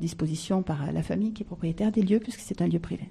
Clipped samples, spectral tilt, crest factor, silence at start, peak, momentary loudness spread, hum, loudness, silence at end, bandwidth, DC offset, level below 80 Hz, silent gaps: under 0.1%; -7 dB/octave; 16 dB; 0 s; -12 dBFS; 6 LU; none; -28 LUFS; 0 s; 13 kHz; under 0.1%; -50 dBFS; none